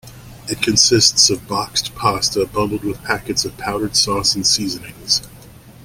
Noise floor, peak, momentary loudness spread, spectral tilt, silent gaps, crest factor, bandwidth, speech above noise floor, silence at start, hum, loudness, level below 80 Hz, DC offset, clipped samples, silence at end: -41 dBFS; 0 dBFS; 12 LU; -2 dB/octave; none; 18 dB; 17 kHz; 23 dB; 0.05 s; none; -16 LUFS; -44 dBFS; under 0.1%; under 0.1%; 0.05 s